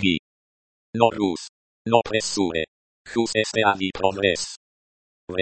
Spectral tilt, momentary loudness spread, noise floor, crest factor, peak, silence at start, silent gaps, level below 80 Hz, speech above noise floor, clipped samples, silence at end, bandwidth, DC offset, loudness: -4 dB/octave; 13 LU; under -90 dBFS; 24 dB; -2 dBFS; 0 s; 0.19-0.93 s, 1.49-1.85 s, 2.68-3.05 s, 4.57-5.28 s; -54 dBFS; over 68 dB; under 0.1%; 0 s; 8.8 kHz; under 0.1%; -23 LUFS